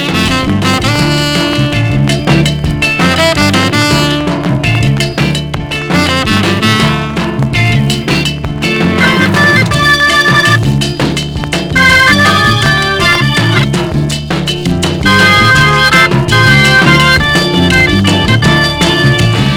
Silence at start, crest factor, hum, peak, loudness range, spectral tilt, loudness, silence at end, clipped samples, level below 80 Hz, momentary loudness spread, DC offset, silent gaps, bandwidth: 0 s; 8 dB; none; 0 dBFS; 4 LU; -4.5 dB/octave; -8 LUFS; 0 s; 0.6%; -26 dBFS; 8 LU; under 0.1%; none; 19 kHz